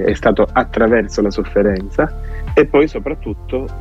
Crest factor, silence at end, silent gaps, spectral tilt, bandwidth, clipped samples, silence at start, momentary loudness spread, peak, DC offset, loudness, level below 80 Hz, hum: 14 dB; 0 s; none; -7 dB/octave; 8 kHz; under 0.1%; 0 s; 10 LU; -2 dBFS; under 0.1%; -16 LUFS; -28 dBFS; none